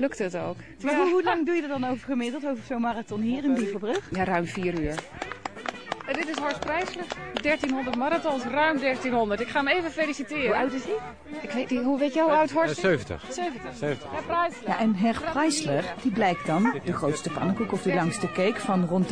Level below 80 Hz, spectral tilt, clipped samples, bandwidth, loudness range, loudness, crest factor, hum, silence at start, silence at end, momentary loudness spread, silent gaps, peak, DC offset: -54 dBFS; -5.5 dB/octave; under 0.1%; 10.5 kHz; 4 LU; -27 LUFS; 16 dB; none; 0 s; 0 s; 9 LU; none; -10 dBFS; 0.3%